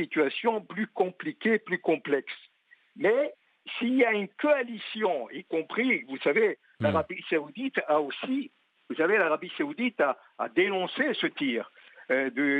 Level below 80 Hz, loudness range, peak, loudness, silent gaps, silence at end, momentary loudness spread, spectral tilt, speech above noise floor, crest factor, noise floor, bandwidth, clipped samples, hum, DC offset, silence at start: -78 dBFS; 2 LU; -12 dBFS; -28 LUFS; none; 0 s; 9 LU; -7 dB/octave; 32 dB; 16 dB; -60 dBFS; 8.8 kHz; under 0.1%; none; under 0.1%; 0 s